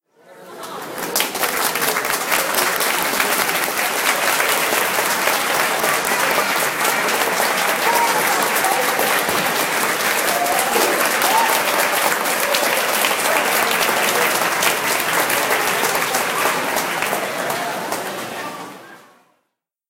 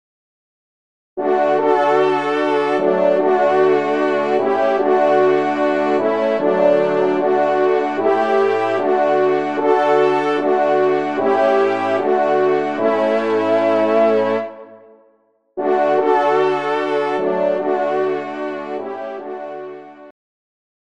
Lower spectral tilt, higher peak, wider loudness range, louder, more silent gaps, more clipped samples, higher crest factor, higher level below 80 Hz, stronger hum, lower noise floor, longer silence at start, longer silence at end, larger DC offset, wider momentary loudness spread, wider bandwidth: second, -1 dB/octave vs -6.5 dB/octave; about the same, 0 dBFS vs -2 dBFS; about the same, 3 LU vs 3 LU; about the same, -17 LUFS vs -17 LUFS; neither; neither; first, 20 dB vs 14 dB; first, -64 dBFS vs -70 dBFS; neither; first, -74 dBFS vs -59 dBFS; second, 0.3 s vs 1.15 s; about the same, 0.9 s vs 0.9 s; second, under 0.1% vs 0.4%; second, 6 LU vs 10 LU; first, 17 kHz vs 8.4 kHz